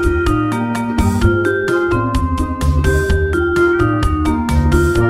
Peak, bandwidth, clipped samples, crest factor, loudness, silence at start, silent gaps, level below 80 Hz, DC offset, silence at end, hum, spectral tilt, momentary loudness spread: -2 dBFS; 15.5 kHz; under 0.1%; 12 dB; -15 LUFS; 0 s; none; -20 dBFS; under 0.1%; 0 s; none; -7 dB/octave; 4 LU